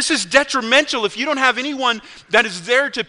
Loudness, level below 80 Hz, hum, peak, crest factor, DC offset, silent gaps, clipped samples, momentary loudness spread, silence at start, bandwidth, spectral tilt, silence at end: -17 LUFS; -56 dBFS; none; 0 dBFS; 18 dB; under 0.1%; none; under 0.1%; 5 LU; 0 s; 11 kHz; -1.5 dB/octave; 0.05 s